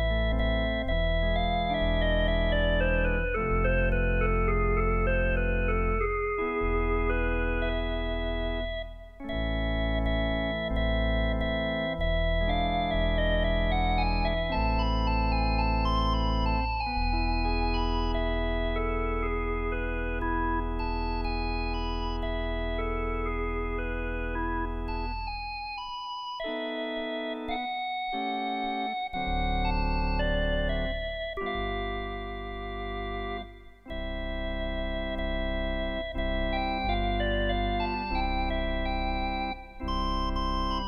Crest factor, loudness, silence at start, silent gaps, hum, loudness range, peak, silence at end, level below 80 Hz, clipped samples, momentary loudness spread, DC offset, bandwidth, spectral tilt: 14 dB; -30 LUFS; 0 s; none; none; 6 LU; -14 dBFS; 0 s; -32 dBFS; under 0.1%; 7 LU; under 0.1%; 6.2 kHz; -7.5 dB/octave